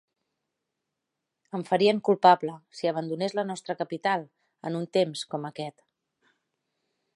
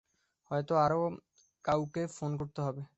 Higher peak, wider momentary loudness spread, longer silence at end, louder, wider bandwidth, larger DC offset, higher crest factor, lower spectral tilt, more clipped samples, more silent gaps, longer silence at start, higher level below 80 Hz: first, -6 dBFS vs -16 dBFS; first, 16 LU vs 9 LU; first, 1.45 s vs 0.15 s; first, -27 LUFS vs -33 LUFS; first, 11.5 kHz vs 8.4 kHz; neither; first, 24 dB vs 18 dB; second, -5.5 dB/octave vs -7 dB/octave; neither; neither; first, 1.55 s vs 0.5 s; second, -82 dBFS vs -64 dBFS